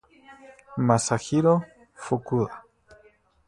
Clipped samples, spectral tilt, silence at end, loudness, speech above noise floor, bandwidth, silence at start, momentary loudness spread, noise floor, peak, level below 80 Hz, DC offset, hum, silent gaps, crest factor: under 0.1%; -6 dB/octave; 0.85 s; -24 LUFS; 35 dB; 11.5 kHz; 0.3 s; 20 LU; -59 dBFS; -4 dBFS; -58 dBFS; under 0.1%; none; none; 22 dB